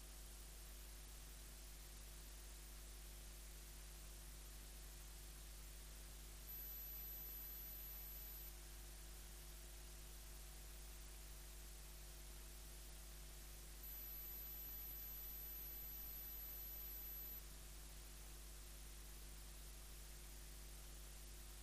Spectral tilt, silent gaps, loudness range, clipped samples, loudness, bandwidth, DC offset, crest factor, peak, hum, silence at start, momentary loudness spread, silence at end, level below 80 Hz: -2.5 dB/octave; none; 7 LU; under 0.1%; -55 LUFS; 15.5 kHz; under 0.1%; 14 dB; -42 dBFS; none; 0 s; 7 LU; 0 s; -58 dBFS